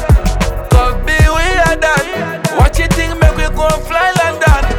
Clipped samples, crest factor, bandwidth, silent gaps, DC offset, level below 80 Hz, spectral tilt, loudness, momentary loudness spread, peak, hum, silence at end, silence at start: under 0.1%; 10 dB; 17.5 kHz; none; under 0.1%; -14 dBFS; -5 dB/octave; -12 LUFS; 5 LU; 0 dBFS; none; 0 s; 0 s